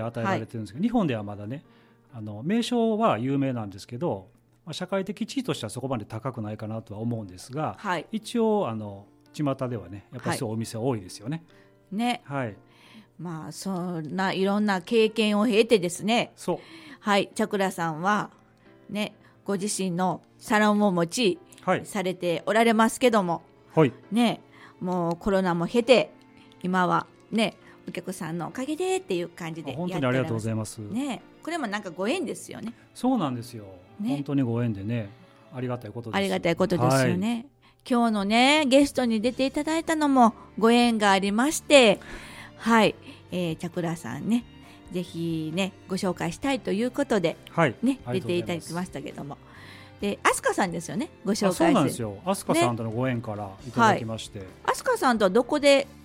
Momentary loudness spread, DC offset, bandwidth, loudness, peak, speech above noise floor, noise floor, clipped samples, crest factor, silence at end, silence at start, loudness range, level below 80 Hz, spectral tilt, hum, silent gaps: 15 LU; under 0.1%; 16 kHz; -26 LUFS; -2 dBFS; 30 dB; -55 dBFS; under 0.1%; 24 dB; 0.05 s; 0 s; 9 LU; -58 dBFS; -5 dB/octave; none; none